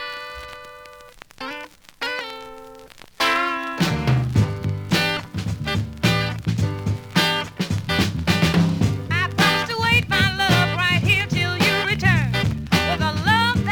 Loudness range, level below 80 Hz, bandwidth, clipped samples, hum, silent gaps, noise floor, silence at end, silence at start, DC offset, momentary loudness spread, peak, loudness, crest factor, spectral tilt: 7 LU; -40 dBFS; 19.5 kHz; under 0.1%; none; none; -44 dBFS; 0 s; 0 s; under 0.1%; 15 LU; -4 dBFS; -20 LUFS; 18 dB; -5 dB/octave